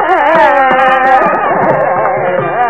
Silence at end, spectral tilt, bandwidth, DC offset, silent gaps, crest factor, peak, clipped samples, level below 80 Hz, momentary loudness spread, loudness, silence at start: 0 s; -6.5 dB/octave; 8 kHz; 1%; none; 10 dB; 0 dBFS; 0.1%; -48 dBFS; 5 LU; -9 LUFS; 0 s